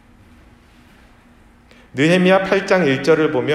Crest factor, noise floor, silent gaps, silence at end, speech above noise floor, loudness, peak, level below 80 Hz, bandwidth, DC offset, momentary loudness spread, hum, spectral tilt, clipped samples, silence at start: 18 dB; -49 dBFS; none; 0 s; 34 dB; -15 LUFS; 0 dBFS; -52 dBFS; 12 kHz; under 0.1%; 4 LU; none; -6 dB/octave; under 0.1%; 1.95 s